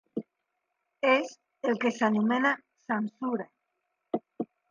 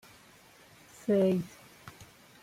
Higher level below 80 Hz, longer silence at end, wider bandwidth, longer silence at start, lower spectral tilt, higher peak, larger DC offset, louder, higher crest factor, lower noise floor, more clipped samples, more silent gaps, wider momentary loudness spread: second, -82 dBFS vs -70 dBFS; second, 0.25 s vs 0.4 s; second, 7.4 kHz vs 16 kHz; second, 0.15 s vs 1.05 s; second, -5.5 dB/octave vs -7.5 dB/octave; first, -10 dBFS vs -18 dBFS; neither; about the same, -29 LUFS vs -29 LUFS; about the same, 20 dB vs 16 dB; first, -82 dBFS vs -58 dBFS; neither; neither; second, 15 LU vs 27 LU